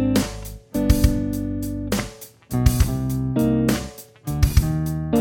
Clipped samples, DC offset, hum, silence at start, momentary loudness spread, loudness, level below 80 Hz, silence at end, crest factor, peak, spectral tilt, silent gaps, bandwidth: under 0.1%; under 0.1%; none; 0 s; 11 LU; -22 LUFS; -28 dBFS; 0 s; 20 dB; -2 dBFS; -6.5 dB/octave; none; 17 kHz